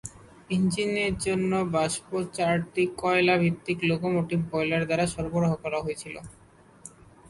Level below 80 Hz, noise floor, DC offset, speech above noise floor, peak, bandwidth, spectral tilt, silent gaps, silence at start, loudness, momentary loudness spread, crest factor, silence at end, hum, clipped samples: -52 dBFS; -50 dBFS; under 0.1%; 24 dB; -10 dBFS; 11.5 kHz; -5.5 dB/octave; none; 0.05 s; -26 LUFS; 15 LU; 18 dB; 0.4 s; none; under 0.1%